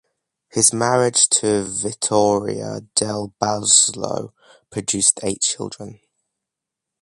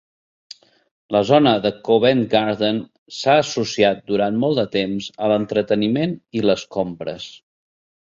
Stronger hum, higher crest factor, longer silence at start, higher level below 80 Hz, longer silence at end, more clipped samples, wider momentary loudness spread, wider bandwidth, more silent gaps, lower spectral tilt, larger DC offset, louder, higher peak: neither; about the same, 20 dB vs 18 dB; second, 0.55 s vs 1.1 s; about the same, -56 dBFS vs -58 dBFS; first, 1.05 s vs 0.85 s; neither; first, 15 LU vs 10 LU; first, 11.5 kHz vs 7.6 kHz; second, none vs 2.98-3.06 s; second, -2.5 dB/octave vs -5.5 dB/octave; neither; about the same, -18 LUFS vs -19 LUFS; about the same, 0 dBFS vs -2 dBFS